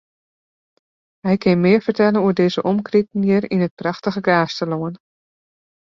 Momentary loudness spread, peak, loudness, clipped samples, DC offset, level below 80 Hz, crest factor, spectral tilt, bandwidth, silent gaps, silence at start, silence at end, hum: 8 LU; -2 dBFS; -18 LUFS; under 0.1%; under 0.1%; -58 dBFS; 16 dB; -7.5 dB/octave; 7.2 kHz; 3.71-3.77 s; 1.25 s; 0.9 s; none